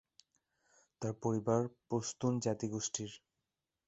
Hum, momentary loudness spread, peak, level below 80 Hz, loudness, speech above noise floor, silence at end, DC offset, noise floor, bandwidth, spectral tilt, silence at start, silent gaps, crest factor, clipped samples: none; 9 LU; -18 dBFS; -72 dBFS; -37 LUFS; 52 dB; 0.7 s; under 0.1%; -89 dBFS; 8.2 kHz; -5.5 dB/octave; 1 s; none; 22 dB; under 0.1%